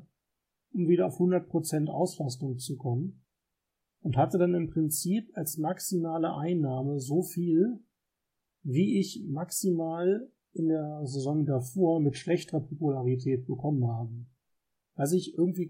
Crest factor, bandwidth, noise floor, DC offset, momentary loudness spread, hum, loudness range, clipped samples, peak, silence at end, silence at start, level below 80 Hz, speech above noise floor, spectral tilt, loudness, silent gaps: 16 dB; 16.5 kHz; -85 dBFS; under 0.1%; 9 LU; none; 2 LU; under 0.1%; -14 dBFS; 0 s; 0.75 s; -66 dBFS; 56 dB; -6.5 dB/octave; -30 LUFS; none